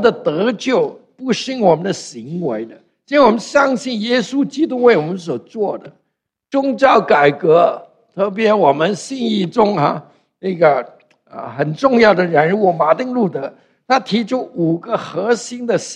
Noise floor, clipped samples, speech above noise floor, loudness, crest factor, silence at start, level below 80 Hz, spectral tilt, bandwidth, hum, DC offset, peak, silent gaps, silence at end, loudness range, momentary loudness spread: -73 dBFS; under 0.1%; 58 dB; -16 LUFS; 16 dB; 0 s; -60 dBFS; -5.5 dB/octave; 10 kHz; none; under 0.1%; 0 dBFS; none; 0 s; 3 LU; 13 LU